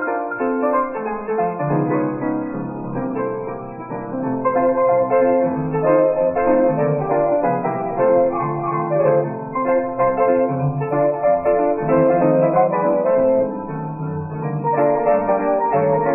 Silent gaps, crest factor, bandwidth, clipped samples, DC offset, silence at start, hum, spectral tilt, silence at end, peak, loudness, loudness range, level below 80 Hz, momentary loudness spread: none; 16 dB; 2.8 kHz; under 0.1%; under 0.1%; 0 s; none; -13.5 dB/octave; 0 s; -2 dBFS; -19 LUFS; 5 LU; -50 dBFS; 10 LU